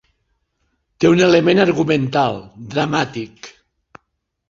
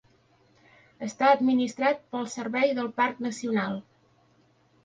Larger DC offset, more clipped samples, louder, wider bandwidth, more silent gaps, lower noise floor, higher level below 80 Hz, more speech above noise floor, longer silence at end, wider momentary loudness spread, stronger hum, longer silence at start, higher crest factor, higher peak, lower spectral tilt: neither; neither; first, -16 LUFS vs -26 LUFS; second, 7.6 kHz vs 9.4 kHz; neither; first, -72 dBFS vs -64 dBFS; first, -54 dBFS vs -72 dBFS; first, 56 dB vs 38 dB; about the same, 1 s vs 1.05 s; first, 15 LU vs 12 LU; neither; about the same, 1 s vs 1 s; about the same, 18 dB vs 20 dB; first, 0 dBFS vs -8 dBFS; about the same, -6 dB/octave vs -5 dB/octave